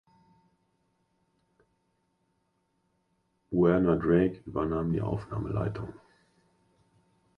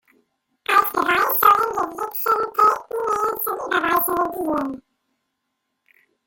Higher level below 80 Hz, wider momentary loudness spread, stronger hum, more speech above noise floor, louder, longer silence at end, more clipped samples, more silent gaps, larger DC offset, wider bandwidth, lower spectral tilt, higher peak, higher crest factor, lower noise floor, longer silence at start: first, -52 dBFS vs -58 dBFS; about the same, 10 LU vs 10 LU; neither; second, 48 dB vs 53 dB; second, -28 LUFS vs -19 LUFS; about the same, 1.4 s vs 1.5 s; neither; neither; neither; second, 5.4 kHz vs 17 kHz; first, -10.5 dB/octave vs -3 dB/octave; second, -12 dBFS vs -2 dBFS; about the same, 20 dB vs 20 dB; about the same, -75 dBFS vs -76 dBFS; first, 3.5 s vs 0.7 s